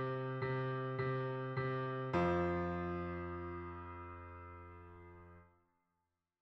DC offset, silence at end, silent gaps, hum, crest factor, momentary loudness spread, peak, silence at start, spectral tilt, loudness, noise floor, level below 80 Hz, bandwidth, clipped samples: under 0.1%; 0.95 s; none; none; 16 dB; 20 LU; -24 dBFS; 0 s; -9 dB/octave; -40 LUFS; -88 dBFS; -62 dBFS; 6.2 kHz; under 0.1%